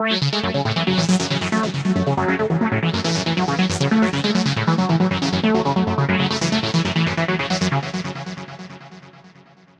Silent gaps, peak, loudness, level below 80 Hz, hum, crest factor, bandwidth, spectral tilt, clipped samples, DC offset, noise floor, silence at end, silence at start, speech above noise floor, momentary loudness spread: none; -4 dBFS; -20 LUFS; -50 dBFS; none; 16 dB; 10.5 kHz; -5.5 dB/octave; under 0.1%; under 0.1%; -49 dBFS; 0.5 s; 0 s; 30 dB; 9 LU